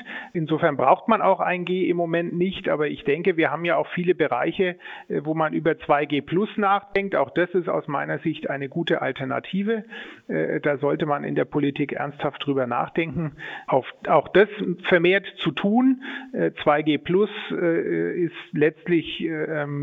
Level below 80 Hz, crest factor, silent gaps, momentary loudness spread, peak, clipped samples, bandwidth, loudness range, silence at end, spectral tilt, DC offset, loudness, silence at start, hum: -60 dBFS; 20 dB; none; 8 LU; -4 dBFS; under 0.1%; 4.7 kHz; 4 LU; 0 s; -8.5 dB/octave; under 0.1%; -23 LUFS; 0 s; none